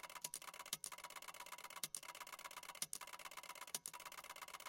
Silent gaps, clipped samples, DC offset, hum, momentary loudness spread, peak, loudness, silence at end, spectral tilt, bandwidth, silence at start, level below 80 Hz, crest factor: none; under 0.1%; under 0.1%; none; 6 LU; -22 dBFS; -50 LUFS; 0 s; 1 dB/octave; 17 kHz; 0 s; -86 dBFS; 32 dB